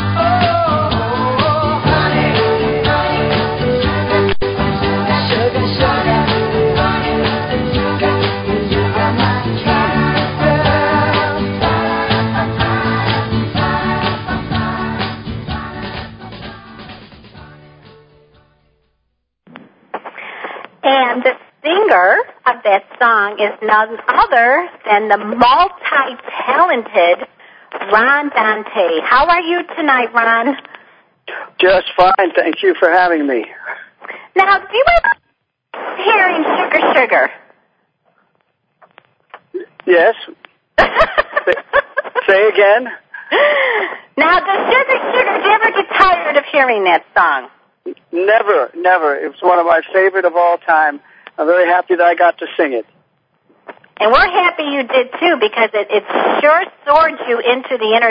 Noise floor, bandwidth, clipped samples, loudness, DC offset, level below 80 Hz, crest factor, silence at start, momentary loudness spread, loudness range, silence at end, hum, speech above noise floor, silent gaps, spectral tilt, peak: -68 dBFS; 8 kHz; under 0.1%; -13 LUFS; under 0.1%; -36 dBFS; 14 dB; 0 s; 13 LU; 6 LU; 0 s; none; 55 dB; none; -8 dB/octave; 0 dBFS